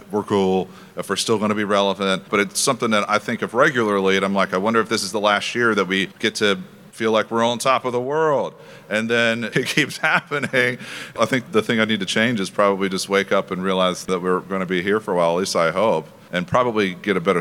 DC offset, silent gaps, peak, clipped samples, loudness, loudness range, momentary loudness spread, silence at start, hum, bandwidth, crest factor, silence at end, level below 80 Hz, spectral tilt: under 0.1%; none; -2 dBFS; under 0.1%; -20 LUFS; 2 LU; 5 LU; 0.05 s; none; 17 kHz; 18 dB; 0 s; -66 dBFS; -4 dB/octave